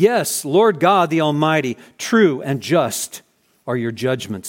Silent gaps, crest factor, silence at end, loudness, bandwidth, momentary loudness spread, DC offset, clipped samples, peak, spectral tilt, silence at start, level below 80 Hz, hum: none; 16 dB; 0 s; -18 LUFS; 17 kHz; 12 LU; under 0.1%; under 0.1%; -2 dBFS; -4.5 dB/octave; 0 s; -66 dBFS; none